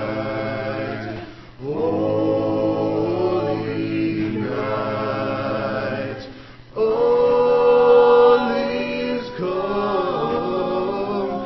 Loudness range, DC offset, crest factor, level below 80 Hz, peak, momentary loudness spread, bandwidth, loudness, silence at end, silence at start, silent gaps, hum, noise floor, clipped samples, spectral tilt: 7 LU; under 0.1%; 16 dB; -50 dBFS; -4 dBFS; 14 LU; 6 kHz; -20 LUFS; 0 s; 0 s; none; none; -40 dBFS; under 0.1%; -8 dB/octave